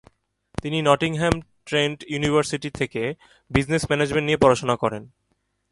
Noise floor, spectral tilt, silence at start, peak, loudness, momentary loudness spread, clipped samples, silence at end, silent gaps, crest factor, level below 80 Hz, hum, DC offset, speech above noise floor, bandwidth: -71 dBFS; -5 dB/octave; 0.65 s; 0 dBFS; -22 LUFS; 11 LU; under 0.1%; 0.65 s; none; 22 dB; -44 dBFS; none; under 0.1%; 49 dB; 11.5 kHz